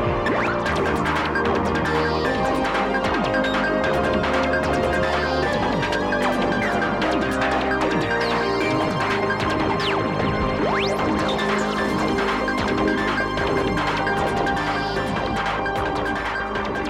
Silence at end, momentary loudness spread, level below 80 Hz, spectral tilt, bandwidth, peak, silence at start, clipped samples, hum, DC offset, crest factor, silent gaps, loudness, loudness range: 0 s; 2 LU; -38 dBFS; -5.5 dB/octave; 16 kHz; -8 dBFS; 0 s; under 0.1%; none; under 0.1%; 14 dB; none; -21 LUFS; 1 LU